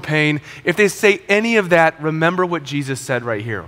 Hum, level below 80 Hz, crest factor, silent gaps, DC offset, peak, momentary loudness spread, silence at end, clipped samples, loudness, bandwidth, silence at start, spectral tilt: none; -56 dBFS; 18 dB; none; under 0.1%; 0 dBFS; 8 LU; 0 s; under 0.1%; -17 LUFS; 16.5 kHz; 0 s; -5 dB/octave